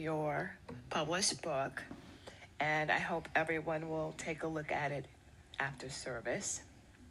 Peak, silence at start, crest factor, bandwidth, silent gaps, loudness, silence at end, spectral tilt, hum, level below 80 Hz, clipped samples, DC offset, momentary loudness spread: -20 dBFS; 0 s; 20 dB; 13 kHz; none; -38 LUFS; 0 s; -3.5 dB/octave; none; -64 dBFS; under 0.1%; under 0.1%; 16 LU